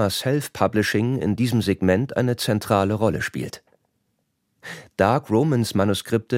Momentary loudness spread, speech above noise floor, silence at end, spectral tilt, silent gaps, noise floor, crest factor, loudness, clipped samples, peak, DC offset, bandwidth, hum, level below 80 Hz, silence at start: 13 LU; 51 dB; 0 s; -6 dB/octave; none; -72 dBFS; 18 dB; -22 LUFS; under 0.1%; -4 dBFS; under 0.1%; 16.5 kHz; none; -54 dBFS; 0 s